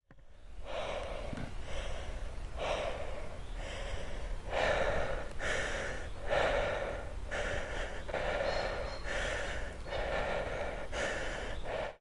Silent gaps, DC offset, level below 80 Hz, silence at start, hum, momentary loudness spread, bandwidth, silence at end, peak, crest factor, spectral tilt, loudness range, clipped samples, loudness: none; under 0.1%; -42 dBFS; 0.1 s; none; 11 LU; 11.5 kHz; 0.05 s; -18 dBFS; 18 dB; -4 dB/octave; 6 LU; under 0.1%; -37 LUFS